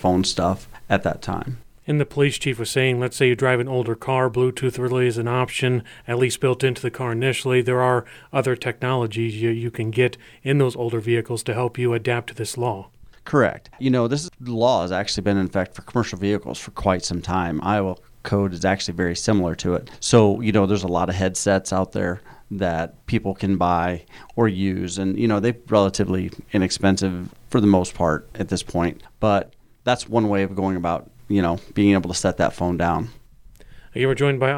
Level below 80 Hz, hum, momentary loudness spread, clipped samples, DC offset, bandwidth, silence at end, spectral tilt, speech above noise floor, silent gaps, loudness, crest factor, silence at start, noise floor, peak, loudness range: -48 dBFS; none; 7 LU; under 0.1%; under 0.1%; 16 kHz; 0 s; -5.5 dB/octave; 25 dB; none; -22 LUFS; 18 dB; 0 s; -46 dBFS; -4 dBFS; 3 LU